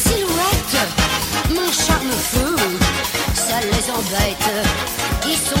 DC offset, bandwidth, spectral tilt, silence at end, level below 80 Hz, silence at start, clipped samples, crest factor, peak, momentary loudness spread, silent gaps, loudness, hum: under 0.1%; 17 kHz; -3 dB/octave; 0 s; -28 dBFS; 0 s; under 0.1%; 16 dB; -2 dBFS; 3 LU; none; -18 LUFS; none